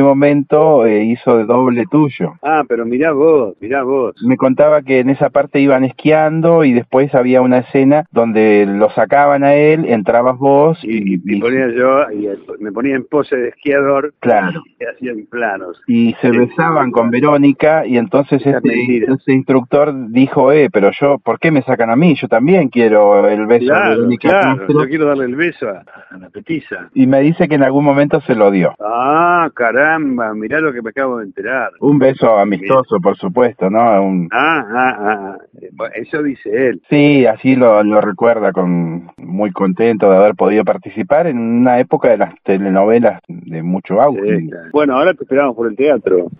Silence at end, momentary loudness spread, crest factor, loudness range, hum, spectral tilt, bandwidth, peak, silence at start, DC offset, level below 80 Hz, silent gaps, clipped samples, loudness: 0.1 s; 9 LU; 12 dB; 4 LU; none; -10.5 dB/octave; 4.9 kHz; 0 dBFS; 0 s; under 0.1%; -56 dBFS; none; under 0.1%; -12 LUFS